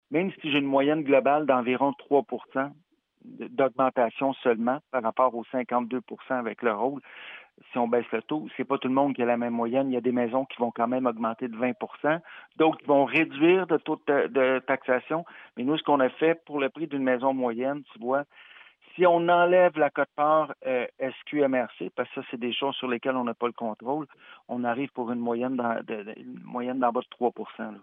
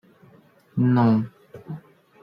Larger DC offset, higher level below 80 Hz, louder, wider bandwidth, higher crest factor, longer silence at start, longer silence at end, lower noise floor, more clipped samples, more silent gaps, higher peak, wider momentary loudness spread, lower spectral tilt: neither; second, -86 dBFS vs -64 dBFS; second, -26 LUFS vs -21 LUFS; second, 3.9 kHz vs 5.4 kHz; about the same, 18 dB vs 16 dB; second, 0.1 s vs 0.75 s; second, 0.05 s vs 0.45 s; about the same, -52 dBFS vs -54 dBFS; neither; neither; about the same, -8 dBFS vs -10 dBFS; second, 12 LU vs 20 LU; second, -8.5 dB/octave vs -10.5 dB/octave